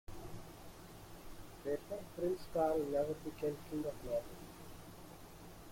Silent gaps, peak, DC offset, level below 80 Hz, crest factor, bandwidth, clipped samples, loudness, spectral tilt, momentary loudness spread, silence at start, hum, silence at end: none; -24 dBFS; under 0.1%; -60 dBFS; 18 dB; 16.5 kHz; under 0.1%; -40 LUFS; -6 dB/octave; 19 LU; 0.1 s; none; 0 s